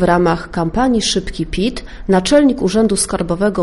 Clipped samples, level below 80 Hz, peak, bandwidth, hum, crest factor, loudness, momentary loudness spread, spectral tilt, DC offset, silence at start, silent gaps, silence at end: under 0.1%; -32 dBFS; -2 dBFS; 11.5 kHz; none; 14 dB; -15 LUFS; 8 LU; -4.5 dB/octave; under 0.1%; 0 s; none; 0 s